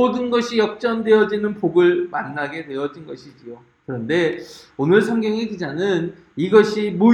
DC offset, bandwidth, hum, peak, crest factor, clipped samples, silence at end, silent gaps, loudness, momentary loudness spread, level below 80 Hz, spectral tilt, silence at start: under 0.1%; 9.8 kHz; none; -2 dBFS; 18 dB; under 0.1%; 0 s; none; -19 LUFS; 18 LU; -62 dBFS; -6.5 dB/octave; 0 s